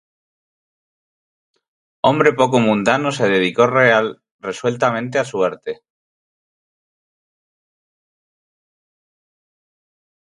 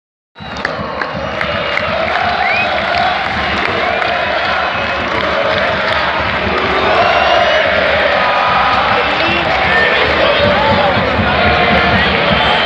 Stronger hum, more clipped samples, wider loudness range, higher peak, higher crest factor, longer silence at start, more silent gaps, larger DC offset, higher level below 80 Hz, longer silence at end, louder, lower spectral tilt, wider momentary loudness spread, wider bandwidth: neither; neither; first, 10 LU vs 3 LU; about the same, 0 dBFS vs 0 dBFS; first, 20 dB vs 12 dB; first, 2.05 s vs 0.35 s; first, 4.31-4.39 s vs none; neither; second, -62 dBFS vs -32 dBFS; first, 4.65 s vs 0 s; second, -16 LUFS vs -12 LUFS; about the same, -5.5 dB/octave vs -5 dB/octave; first, 15 LU vs 6 LU; first, 11 kHz vs 9.4 kHz